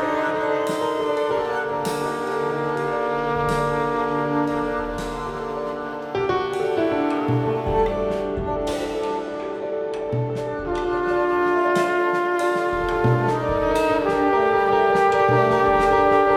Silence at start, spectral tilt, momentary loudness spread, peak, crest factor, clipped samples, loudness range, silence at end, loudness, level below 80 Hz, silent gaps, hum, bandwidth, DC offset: 0 s; -6.5 dB/octave; 10 LU; -4 dBFS; 18 dB; under 0.1%; 5 LU; 0 s; -22 LUFS; -42 dBFS; none; none; 15 kHz; under 0.1%